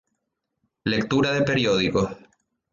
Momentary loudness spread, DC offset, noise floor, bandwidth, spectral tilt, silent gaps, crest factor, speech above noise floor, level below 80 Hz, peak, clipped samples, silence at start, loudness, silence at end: 7 LU; under 0.1%; -79 dBFS; 7.6 kHz; -5.5 dB/octave; none; 16 dB; 57 dB; -52 dBFS; -10 dBFS; under 0.1%; 0.85 s; -23 LUFS; 0.55 s